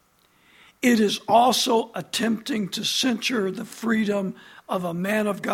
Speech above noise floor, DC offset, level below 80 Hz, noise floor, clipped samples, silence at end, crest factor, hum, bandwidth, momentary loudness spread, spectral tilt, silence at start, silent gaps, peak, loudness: 38 dB; under 0.1%; -66 dBFS; -61 dBFS; under 0.1%; 0 s; 18 dB; none; 16.5 kHz; 10 LU; -3.5 dB/octave; 0.8 s; none; -6 dBFS; -23 LUFS